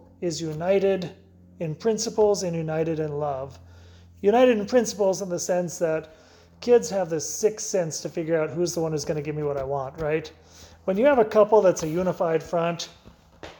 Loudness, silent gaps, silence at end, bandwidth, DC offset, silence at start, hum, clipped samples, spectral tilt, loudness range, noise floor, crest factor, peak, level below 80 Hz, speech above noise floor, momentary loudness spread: -24 LUFS; none; 0.05 s; 19 kHz; under 0.1%; 0.2 s; none; under 0.1%; -5 dB/octave; 4 LU; -49 dBFS; 18 dB; -6 dBFS; -56 dBFS; 25 dB; 11 LU